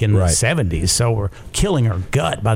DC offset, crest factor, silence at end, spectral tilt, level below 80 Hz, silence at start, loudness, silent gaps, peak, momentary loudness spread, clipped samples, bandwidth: under 0.1%; 14 dB; 0 s; -4.5 dB/octave; -32 dBFS; 0 s; -18 LUFS; none; -4 dBFS; 6 LU; under 0.1%; 16.5 kHz